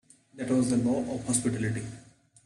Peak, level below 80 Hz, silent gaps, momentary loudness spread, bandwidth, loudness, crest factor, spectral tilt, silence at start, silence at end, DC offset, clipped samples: -12 dBFS; -58 dBFS; none; 12 LU; 12.5 kHz; -29 LUFS; 18 dB; -5.5 dB/octave; 0.35 s; 0.45 s; under 0.1%; under 0.1%